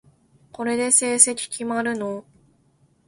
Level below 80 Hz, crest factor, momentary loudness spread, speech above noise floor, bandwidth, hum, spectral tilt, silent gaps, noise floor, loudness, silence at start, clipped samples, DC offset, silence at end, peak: -68 dBFS; 24 dB; 15 LU; 40 dB; 15 kHz; none; -1.5 dB/octave; none; -61 dBFS; -20 LUFS; 0.6 s; under 0.1%; under 0.1%; 0.85 s; 0 dBFS